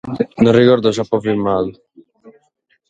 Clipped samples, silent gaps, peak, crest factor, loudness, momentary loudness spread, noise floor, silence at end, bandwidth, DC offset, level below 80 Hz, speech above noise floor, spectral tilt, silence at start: under 0.1%; none; 0 dBFS; 16 dB; -15 LUFS; 10 LU; -63 dBFS; 0.6 s; 9 kHz; under 0.1%; -50 dBFS; 48 dB; -7 dB/octave; 0.05 s